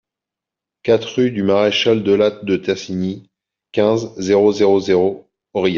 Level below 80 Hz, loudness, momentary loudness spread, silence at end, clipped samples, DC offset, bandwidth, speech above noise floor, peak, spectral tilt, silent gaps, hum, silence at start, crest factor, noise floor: -58 dBFS; -17 LUFS; 11 LU; 0 s; under 0.1%; under 0.1%; 7.4 kHz; 70 dB; -2 dBFS; -4.5 dB/octave; none; none; 0.85 s; 14 dB; -86 dBFS